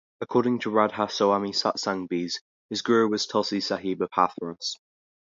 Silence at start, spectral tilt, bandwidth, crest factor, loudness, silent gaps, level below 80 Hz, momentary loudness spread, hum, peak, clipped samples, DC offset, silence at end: 0.2 s; -4.5 dB/octave; 7.6 kHz; 22 dB; -26 LUFS; 2.41-2.69 s; -68 dBFS; 10 LU; none; -4 dBFS; under 0.1%; under 0.1%; 0.45 s